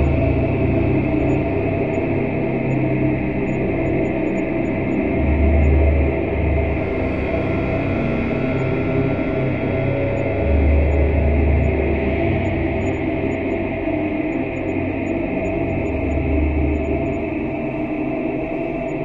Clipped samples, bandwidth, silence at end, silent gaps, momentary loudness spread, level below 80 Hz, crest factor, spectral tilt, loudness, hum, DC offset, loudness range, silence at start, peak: under 0.1%; 7.2 kHz; 0 s; none; 5 LU; -26 dBFS; 14 dB; -9.5 dB/octave; -20 LUFS; none; under 0.1%; 3 LU; 0 s; -4 dBFS